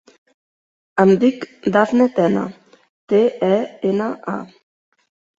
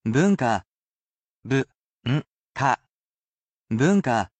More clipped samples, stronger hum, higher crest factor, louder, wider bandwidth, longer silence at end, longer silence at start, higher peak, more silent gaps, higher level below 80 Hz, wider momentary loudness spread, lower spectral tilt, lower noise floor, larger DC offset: neither; neither; about the same, 18 dB vs 18 dB; first, -18 LUFS vs -24 LUFS; second, 7.8 kHz vs 8.8 kHz; first, 0.95 s vs 0.15 s; first, 0.95 s vs 0.05 s; first, -2 dBFS vs -8 dBFS; second, 2.89-3.08 s vs 0.67-1.43 s, 1.78-2.01 s, 2.30-2.55 s, 2.91-3.64 s; about the same, -62 dBFS vs -58 dBFS; about the same, 12 LU vs 11 LU; about the same, -7.5 dB/octave vs -6.5 dB/octave; about the same, under -90 dBFS vs under -90 dBFS; neither